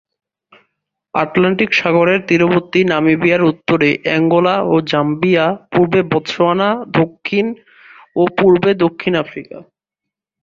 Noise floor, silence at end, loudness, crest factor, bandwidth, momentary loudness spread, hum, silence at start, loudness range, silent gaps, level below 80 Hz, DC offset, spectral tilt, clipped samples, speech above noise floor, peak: -82 dBFS; 0.8 s; -14 LUFS; 14 dB; 7.2 kHz; 7 LU; none; 1.15 s; 3 LU; none; -54 dBFS; under 0.1%; -7 dB/octave; under 0.1%; 69 dB; 0 dBFS